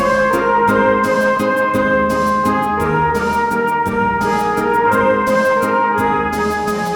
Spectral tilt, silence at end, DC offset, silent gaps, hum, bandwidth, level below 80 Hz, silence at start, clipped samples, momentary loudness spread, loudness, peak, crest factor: -5.5 dB/octave; 0 s; under 0.1%; none; none; 19 kHz; -40 dBFS; 0 s; under 0.1%; 3 LU; -15 LUFS; 0 dBFS; 14 dB